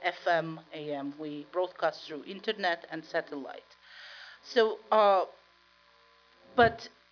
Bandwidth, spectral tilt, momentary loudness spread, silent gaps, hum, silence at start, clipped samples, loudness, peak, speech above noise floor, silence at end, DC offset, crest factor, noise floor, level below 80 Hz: 5.4 kHz; -5 dB/octave; 20 LU; none; none; 0 s; under 0.1%; -30 LUFS; -12 dBFS; 33 dB; 0.25 s; under 0.1%; 20 dB; -63 dBFS; -66 dBFS